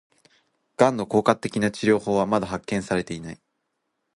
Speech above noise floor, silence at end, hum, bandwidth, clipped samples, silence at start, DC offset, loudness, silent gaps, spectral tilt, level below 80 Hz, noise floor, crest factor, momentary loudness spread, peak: 54 dB; 0.8 s; none; 11.5 kHz; under 0.1%; 0.8 s; under 0.1%; -23 LUFS; none; -6 dB/octave; -56 dBFS; -77 dBFS; 22 dB; 13 LU; -2 dBFS